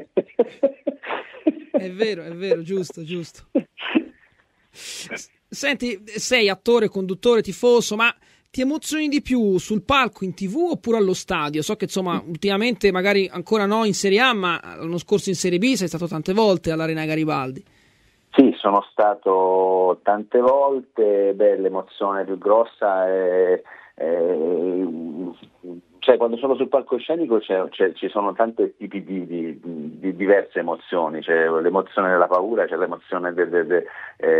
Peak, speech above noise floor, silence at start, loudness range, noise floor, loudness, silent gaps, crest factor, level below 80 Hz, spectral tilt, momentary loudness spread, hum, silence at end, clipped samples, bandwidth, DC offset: 0 dBFS; 40 dB; 0 s; 6 LU; -61 dBFS; -21 LUFS; none; 20 dB; -56 dBFS; -4.5 dB/octave; 12 LU; none; 0 s; under 0.1%; 15 kHz; under 0.1%